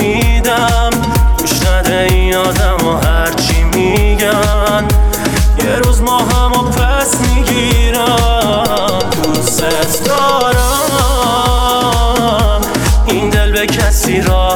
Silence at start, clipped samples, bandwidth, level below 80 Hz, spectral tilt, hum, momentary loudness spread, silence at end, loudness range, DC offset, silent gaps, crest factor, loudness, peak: 0 s; under 0.1%; 19 kHz; -14 dBFS; -4.5 dB/octave; none; 2 LU; 0 s; 0 LU; under 0.1%; none; 10 dB; -12 LUFS; 0 dBFS